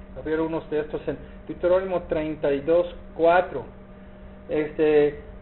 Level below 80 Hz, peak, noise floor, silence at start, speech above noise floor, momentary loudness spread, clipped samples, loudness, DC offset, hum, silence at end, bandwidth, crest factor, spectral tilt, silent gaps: -46 dBFS; -6 dBFS; -43 dBFS; 0 s; 20 dB; 14 LU; under 0.1%; -24 LUFS; under 0.1%; none; 0 s; 4.2 kHz; 18 dB; -5 dB/octave; none